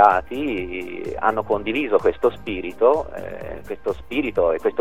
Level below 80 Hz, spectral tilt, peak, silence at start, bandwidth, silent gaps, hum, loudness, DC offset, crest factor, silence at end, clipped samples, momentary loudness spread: -46 dBFS; -6.5 dB/octave; 0 dBFS; 0 s; 14.5 kHz; none; none; -22 LUFS; 1%; 20 dB; 0 s; under 0.1%; 12 LU